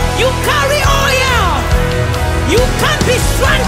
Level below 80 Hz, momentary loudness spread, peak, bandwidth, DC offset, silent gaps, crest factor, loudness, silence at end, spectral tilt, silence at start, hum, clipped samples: -18 dBFS; 4 LU; 0 dBFS; 16.5 kHz; under 0.1%; none; 12 dB; -12 LUFS; 0 s; -4 dB/octave; 0 s; none; under 0.1%